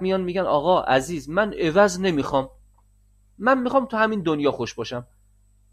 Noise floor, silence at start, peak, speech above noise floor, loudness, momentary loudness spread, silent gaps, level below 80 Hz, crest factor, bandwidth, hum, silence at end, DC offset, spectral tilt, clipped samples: -58 dBFS; 0 s; -4 dBFS; 36 dB; -22 LUFS; 10 LU; none; -50 dBFS; 18 dB; 14.5 kHz; 50 Hz at -50 dBFS; 0.7 s; under 0.1%; -5.5 dB/octave; under 0.1%